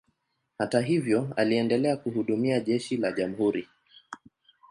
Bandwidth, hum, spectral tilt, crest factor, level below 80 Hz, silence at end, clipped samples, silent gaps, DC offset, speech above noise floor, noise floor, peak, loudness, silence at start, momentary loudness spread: 11.5 kHz; none; -6.5 dB/octave; 18 dB; -68 dBFS; 0.55 s; under 0.1%; none; under 0.1%; 50 dB; -76 dBFS; -8 dBFS; -27 LUFS; 0.6 s; 14 LU